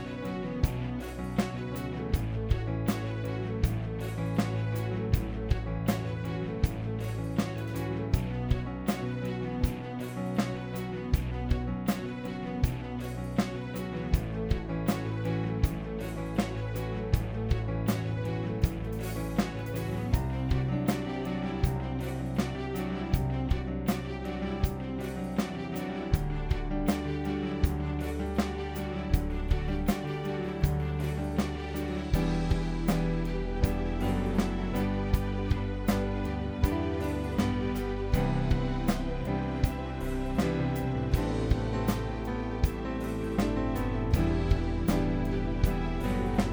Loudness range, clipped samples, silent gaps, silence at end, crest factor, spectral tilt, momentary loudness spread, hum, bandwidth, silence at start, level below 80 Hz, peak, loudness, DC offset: 2 LU; under 0.1%; none; 0 s; 20 dB; -7 dB/octave; 5 LU; none; over 20 kHz; 0 s; -36 dBFS; -10 dBFS; -32 LUFS; under 0.1%